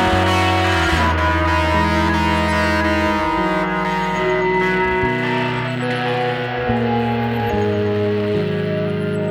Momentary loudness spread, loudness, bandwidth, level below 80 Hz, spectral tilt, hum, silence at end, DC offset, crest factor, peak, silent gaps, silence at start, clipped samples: 5 LU; -18 LUFS; 19 kHz; -32 dBFS; -6 dB/octave; none; 0 s; under 0.1%; 14 dB; -4 dBFS; none; 0 s; under 0.1%